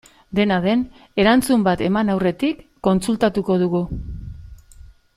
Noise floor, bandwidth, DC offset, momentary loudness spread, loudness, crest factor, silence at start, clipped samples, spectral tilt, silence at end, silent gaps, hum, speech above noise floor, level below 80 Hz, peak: -45 dBFS; 15 kHz; under 0.1%; 12 LU; -19 LUFS; 18 dB; 0.3 s; under 0.1%; -6 dB/octave; 0.35 s; none; none; 26 dB; -40 dBFS; -2 dBFS